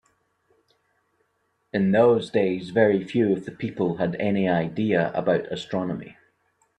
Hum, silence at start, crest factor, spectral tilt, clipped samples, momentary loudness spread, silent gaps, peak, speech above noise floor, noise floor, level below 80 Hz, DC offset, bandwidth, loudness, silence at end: none; 1.75 s; 18 dB; -8 dB/octave; under 0.1%; 10 LU; none; -6 dBFS; 49 dB; -72 dBFS; -62 dBFS; under 0.1%; 9.8 kHz; -23 LUFS; 0.65 s